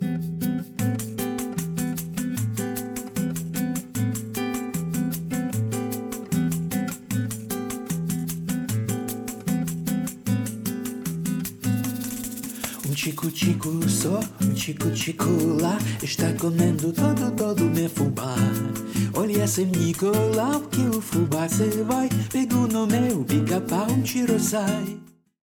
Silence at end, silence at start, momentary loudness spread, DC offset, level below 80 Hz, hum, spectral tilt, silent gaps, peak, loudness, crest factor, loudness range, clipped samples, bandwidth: 0.4 s; 0 s; 7 LU; under 0.1%; -56 dBFS; none; -5.5 dB/octave; none; -8 dBFS; -25 LUFS; 16 dB; 5 LU; under 0.1%; over 20 kHz